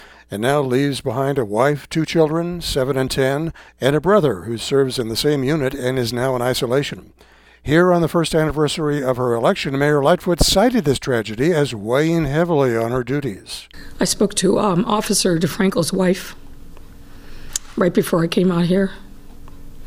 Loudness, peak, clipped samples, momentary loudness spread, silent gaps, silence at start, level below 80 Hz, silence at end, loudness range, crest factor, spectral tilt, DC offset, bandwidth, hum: -18 LUFS; 0 dBFS; under 0.1%; 8 LU; none; 0 s; -38 dBFS; 0 s; 3 LU; 18 dB; -5 dB/octave; under 0.1%; 17.5 kHz; none